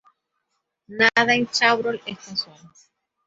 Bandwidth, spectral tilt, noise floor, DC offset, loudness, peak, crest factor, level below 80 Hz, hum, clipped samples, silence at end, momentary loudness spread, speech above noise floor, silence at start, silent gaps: 8 kHz; -2.5 dB/octave; -77 dBFS; under 0.1%; -20 LUFS; -2 dBFS; 22 dB; -66 dBFS; none; under 0.1%; 0.85 s; 16 LU; 55 dB; 0.9 s; none